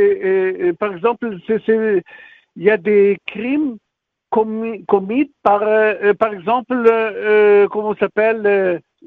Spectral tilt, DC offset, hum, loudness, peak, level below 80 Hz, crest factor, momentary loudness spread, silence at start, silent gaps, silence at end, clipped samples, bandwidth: -4.5 dB/octave; under 0.1%; none; -16 LUFS; 0 dBFS; -60 dBFS; 16 dB; 7 LU; 0 s; none; 0.3 s; under 0.1%; 4.2 kHz